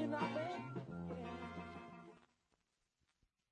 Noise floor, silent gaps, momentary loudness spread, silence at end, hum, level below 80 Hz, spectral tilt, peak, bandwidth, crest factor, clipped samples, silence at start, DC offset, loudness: -85 dBFS; none; 16 LU; 1.25 s; none; -78 dBFS; -7 dB/octave; -28 dBFS; 10 kHz; 20 dB; under 0.1%; 0 s; under 0.1%; -46 LUFS